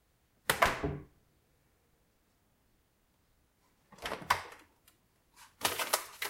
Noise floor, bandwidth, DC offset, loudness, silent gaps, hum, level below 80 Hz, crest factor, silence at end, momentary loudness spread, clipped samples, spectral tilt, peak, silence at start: -73 dBFS; 16 kHz; under 0.1%; -34 LUFS; none; none; -58 dBFS; 30 dB; 0 s; 15 LU; under 0.1%; -2 dB/octave; -10 dBFS; 0.5 s